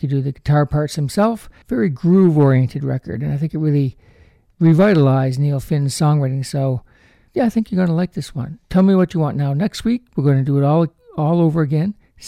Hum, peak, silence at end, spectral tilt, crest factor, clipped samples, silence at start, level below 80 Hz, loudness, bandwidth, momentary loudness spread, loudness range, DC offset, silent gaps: none; -4 dBFS; 0 s; -8 dB/octave; 12 dB; under 0.1%; 0 s; -46 dBFS; -17 LUFS; 13.5 kHz; 10 LU; 2 LU; under 0.1%; none